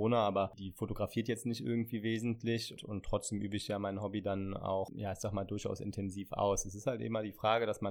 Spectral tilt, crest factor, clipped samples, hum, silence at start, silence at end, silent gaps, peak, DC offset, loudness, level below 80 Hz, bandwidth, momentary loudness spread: -5.5 dB/octave; 20 dB; under 0.1%; none; 0 s; 0 s; none; -16 dBFS; under 0.1%; -37 LUFS; -56 dBFS; 18.5 kHz; 7 LU